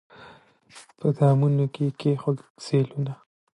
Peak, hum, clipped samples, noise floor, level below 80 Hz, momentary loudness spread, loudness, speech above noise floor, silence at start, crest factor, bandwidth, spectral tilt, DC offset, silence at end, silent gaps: -8 dBFS; none; under 0.1%; -52 dBFS; -70 dBFS; 12 LU; -25 LUFS; 29 dB; 0.2 s; 18 dB; 10.5 kHz; -8.5 dB/octave; under 0.1%; 0.4 s; 2.50-2.55 s